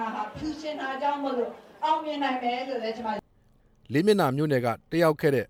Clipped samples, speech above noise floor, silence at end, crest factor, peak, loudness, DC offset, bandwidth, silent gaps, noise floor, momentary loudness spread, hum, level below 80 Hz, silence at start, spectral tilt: under 0.1%; 35 dB; 0.05 s; 18 dB; -10 dBFS; -27 LUFS; under 0.1%; 17 kHz; none; -61 dBFS; 11 LU; none; -60 dBFS; 0 s; -6.5 dB/octave